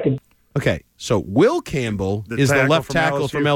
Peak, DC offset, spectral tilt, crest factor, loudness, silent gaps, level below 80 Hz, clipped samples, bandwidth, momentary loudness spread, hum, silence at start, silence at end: -4 dBFS; under 0.1%; -5.5 dB/octave; 14 dB; -20 LUFS; none; -44 dBFS; under 0.1%; 17 kHz; 8 LU; none; 0 s; 0 s